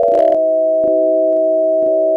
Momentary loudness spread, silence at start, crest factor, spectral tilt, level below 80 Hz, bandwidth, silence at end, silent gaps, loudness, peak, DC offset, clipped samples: 2 LU; 0 s; 8 dB; -8 dB/octave; -58 dBFS; 3.4 kHz; 0 s; none; -13 LUFS; -4 dBFS; under 0.1%; under 0.1%